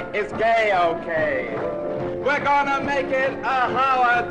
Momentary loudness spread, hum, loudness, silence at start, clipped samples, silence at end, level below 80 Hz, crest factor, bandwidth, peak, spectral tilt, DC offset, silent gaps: 8 LU; none; -21 LUFS; 0 s; under 0.1%; 0 s; -50 dBFS; 12 dB; 9.8 kHz; -10 dBFS; -5.5 dB/octave; under 0.1%; none